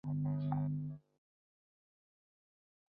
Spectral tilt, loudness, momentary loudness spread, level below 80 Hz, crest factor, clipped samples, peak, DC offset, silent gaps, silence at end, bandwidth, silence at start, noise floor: -11 dB/octave; -39 LUFS; 11 LU; -70 dBFS; 18 dB; under 0.1%; -24 dBFS; under 0.1%; none; 2 s; 4.3 kHz; 0.05 s; under -90 dBFS